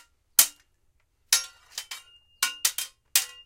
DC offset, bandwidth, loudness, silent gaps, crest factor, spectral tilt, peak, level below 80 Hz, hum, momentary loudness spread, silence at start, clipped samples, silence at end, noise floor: under 0.1%; 17 kHz; -24 LUFS; none; 30 dB; 3.5 dB/octave; 0 dBFS; -68 dBFS; none; 18 LU; 0.4 s; under 0.1%; 0.15 s; -68 dBFS